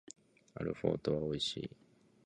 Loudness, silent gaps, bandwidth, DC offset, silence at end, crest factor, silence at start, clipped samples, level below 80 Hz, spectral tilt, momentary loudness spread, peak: -38 LUFS; none; 11 kHz; under 0.1%; 0.6 s; 22 dB; 0.55 s; under 0.1%; -62 dBFS; -5.5 dB/octave; 21 LU; -18 dBFS